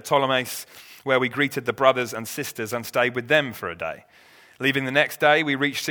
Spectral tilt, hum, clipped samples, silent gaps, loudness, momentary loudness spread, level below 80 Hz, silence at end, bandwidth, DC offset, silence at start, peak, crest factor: -4 dB/octave; none; under 0.1%; none; -23 LUFS; 13 LU; -66 dBFS; 0 s; over 20 kHz; under 0.1%; 0.05 s; -2 dBFS; 22 dB